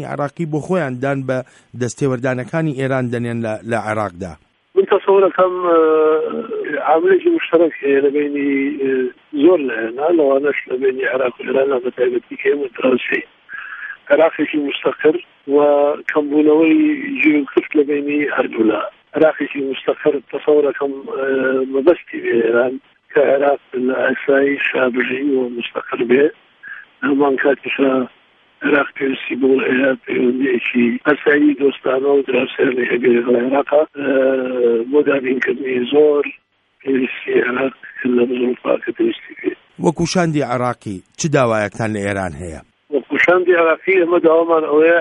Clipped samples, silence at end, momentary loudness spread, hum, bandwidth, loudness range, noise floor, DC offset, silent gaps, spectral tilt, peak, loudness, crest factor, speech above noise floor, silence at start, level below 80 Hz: under 0.1%; 0 s; 10 LU; none; 11 kHz; 4 LU; -37 dBFS; under 0.1%; none; -6 dB/octave; 0 dBFS; -16 LUFS; 16 dB; 21 dB; 0 s; -56 dBFS